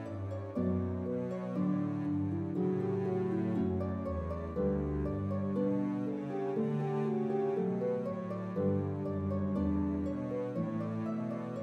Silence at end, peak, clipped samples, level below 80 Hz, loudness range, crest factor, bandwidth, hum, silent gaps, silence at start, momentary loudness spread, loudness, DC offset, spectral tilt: 0 s; -20 dBFS; under 0.1%; -52 dBFS; 1 LU; 12 dB; 6.6 kHz; none; none; 0 s; 4 LU; -35 LUFS; under 0.1%; -10.5 dB/octave